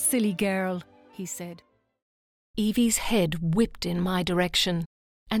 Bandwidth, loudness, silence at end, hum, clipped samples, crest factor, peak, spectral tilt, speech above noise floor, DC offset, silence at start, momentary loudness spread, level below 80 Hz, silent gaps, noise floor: 20 kHz; -26 LUFS; 0 s; none; under 0.1%; 16 dB; -12 dBFS; -4 dB/octave; over 64 dB; under 0.1%; 0 s; 14 LU; -48 dBFS; 2.02-2.54 s, 4.86-5.26 s; under -90 dBFS